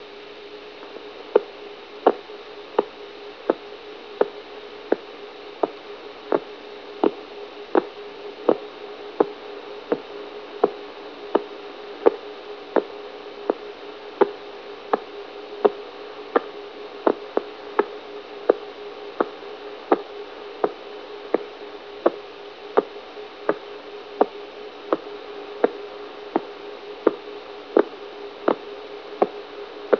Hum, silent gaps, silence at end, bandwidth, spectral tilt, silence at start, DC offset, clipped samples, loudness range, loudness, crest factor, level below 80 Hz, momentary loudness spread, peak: none; none; 0 s; 5.4 kHz; -2.5 dB/octave; 0 s; 0.1%; under 0.1%; 2 LU; -27 LUFS; 26 dB; -70 dBFS; 15 LU; 0 dBFS